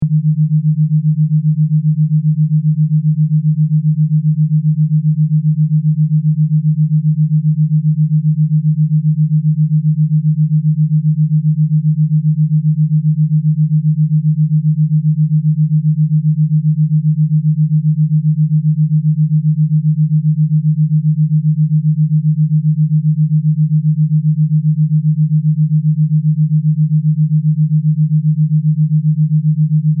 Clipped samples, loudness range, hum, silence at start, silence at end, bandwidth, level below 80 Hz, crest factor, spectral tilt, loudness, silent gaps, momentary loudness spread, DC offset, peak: under 0.1%; 0 LU; none; 0 s; 0 s; 0.2 kHz; -62 dBFS; 6 dB; -27.5 dB/octave; -13 LUFS; none; 0 LU; under 0.1%; -6 dBFS